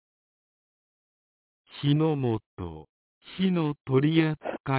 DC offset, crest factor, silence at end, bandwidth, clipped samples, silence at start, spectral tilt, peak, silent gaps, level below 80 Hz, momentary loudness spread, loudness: under 0.1%; 18 dB; 0 s; 4 kHz; under 0.1%; 1.75 s; -11.5 dB/octave; -10 dBFS; 2.46-2.57 s, 2.89-3.21 s, 4.60-4.64 s; -58 dBFS; 18 LU; -26 LUFS